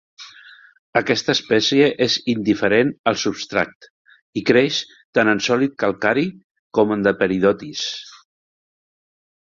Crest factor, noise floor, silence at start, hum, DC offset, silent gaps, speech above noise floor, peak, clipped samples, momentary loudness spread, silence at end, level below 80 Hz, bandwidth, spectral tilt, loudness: 18 dB; -46 dBFS; 0.2 s; none; under 0.1%; 0.79-0.93 s, 2.99-3.04 s, 3.75-3.81 s, 3.90-4.05 s, 4.22-4.33 s, 5.05-5.13 s, 6.44-6.70 s; 27 dB; -2 dBFS; under 0.1%; 9 LU; 1.45 s; -58 dBFS; 7.6 kHz; -4.5 dB/octave; -19 LUFS